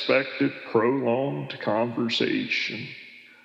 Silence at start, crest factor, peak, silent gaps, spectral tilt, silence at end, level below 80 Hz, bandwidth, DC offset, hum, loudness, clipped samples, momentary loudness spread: 0 s; 18 dB; -8 dBFS; none; -6 dB/octave; 0.15 s; -86 dBFS; 8 kHz; under 0.1%; none; -25 LUFS; under 0.1%; 12 LU